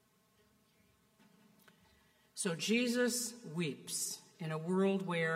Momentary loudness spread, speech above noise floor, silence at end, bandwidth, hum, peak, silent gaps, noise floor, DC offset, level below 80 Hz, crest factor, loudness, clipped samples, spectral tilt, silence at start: 9 LU; 36 dB; 0 s; 16 kHz; none; -20 dBFS; none; -72 dBFS; under 0.1%; -86 dBFS; 18 dB; -36 LUFS; under 0.1%; -4 dB/octave; 2.35 s